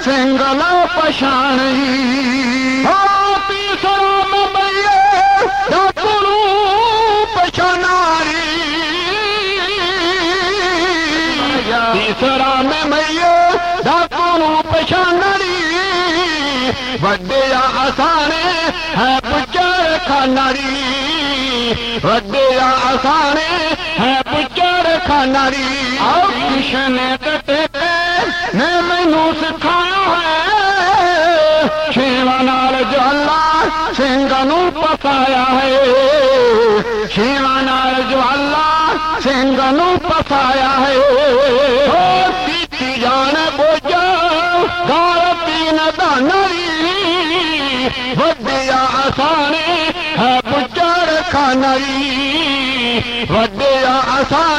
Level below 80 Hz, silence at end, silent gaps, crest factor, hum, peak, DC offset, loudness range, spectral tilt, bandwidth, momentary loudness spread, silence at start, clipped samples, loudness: -38 dBFS; 0 s; none; 12 dB; none; -2 dBFS; under 0.1%; 2 LU; -4 dB/octave; 13 kHz; 4 LU; 0 s; under 0.1%; -13 LUFS